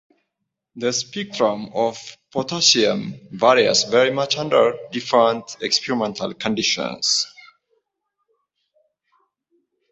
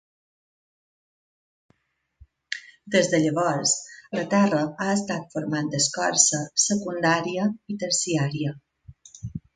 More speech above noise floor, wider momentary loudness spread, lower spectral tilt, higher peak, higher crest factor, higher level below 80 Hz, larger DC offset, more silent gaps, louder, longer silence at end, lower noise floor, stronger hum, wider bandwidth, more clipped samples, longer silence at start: first, 59 dB vs 49 dB; about the same, 12 LU vs 14 LU; about the same, -2.5 dB/octave vs -3.5 dB/octave; about the same, 0 dBFS vs -2 dBFS; about the same, 20 dB vs 24 dB; about the same, -64 dBFS vs -60 dBFS; neither; neither; first, -19 LUFS vs -23 LUFS; first, 2.65 s vs 0.15 s; first, -79 dBFS vs -73 dBFS; neither; second, 8.4 kHz vs 9.6 kHz; neither; second, 0.75 s vs 2.5 s